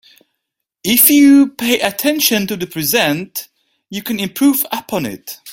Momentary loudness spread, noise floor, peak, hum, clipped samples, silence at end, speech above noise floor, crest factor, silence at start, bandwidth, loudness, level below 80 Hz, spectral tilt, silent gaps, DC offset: 17 LU; -76 dBFS; 0 dBFS; none; under 0.1%; 0 s; 62 dB; 16 dB; 0.85 s; 17 kHz; -13 LUFS; -56 dBFS; -3 dB/octave; none; under 0.1%